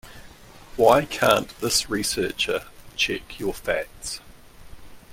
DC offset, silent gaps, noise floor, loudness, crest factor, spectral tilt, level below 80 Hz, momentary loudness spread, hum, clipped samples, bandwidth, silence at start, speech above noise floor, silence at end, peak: under 0.1%; none; -46 dBFS; -23 LUFS; 22 dB; -3 dB/octave; -48 dBFS; 15 LU; none; under 0.1%; 16.5 kHz; 0.05 s; 23 dB; 0 s; -2 dBFS